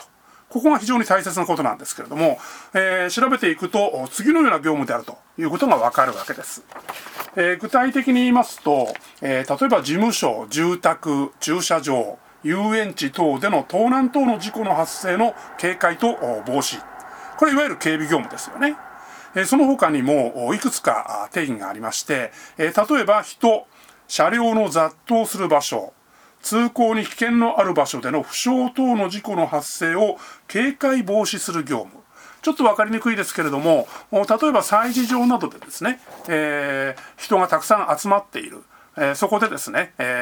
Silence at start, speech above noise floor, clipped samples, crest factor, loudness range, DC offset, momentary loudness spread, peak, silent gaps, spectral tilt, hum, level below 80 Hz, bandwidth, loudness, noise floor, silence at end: 0 s; 30 dB; under 0.1%; 20 dB; 2 LU; under 0.1%; 10 LU; 0 dBFS; none; -4 dB/octave; none; -66 dBFS; over 20 kHz; -20 LUFS; -50 dBFS; 0 s